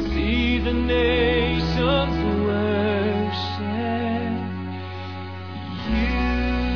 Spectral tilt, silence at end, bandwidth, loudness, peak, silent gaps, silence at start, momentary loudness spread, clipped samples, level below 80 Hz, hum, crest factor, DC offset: -7.5 dB/octave; 0 s; 5.4 kHz; -23 LUFS; -8 dBFS; none; 0 s; 12 LU; under 0.1%; -30 dBFS; none; 14 dB; 0.6%